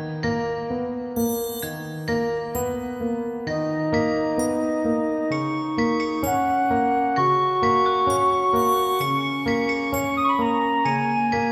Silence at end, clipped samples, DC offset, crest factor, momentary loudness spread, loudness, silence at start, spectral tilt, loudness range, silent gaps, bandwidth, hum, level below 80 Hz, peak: 0 s; under 0.1%; under 0.1%; 14 dB; 8 LU; -23 LUFS; 0 s; -5.5 dB/octave; 6 LU; none; 17 kHz; none; -50 dBFS; -10 dBFS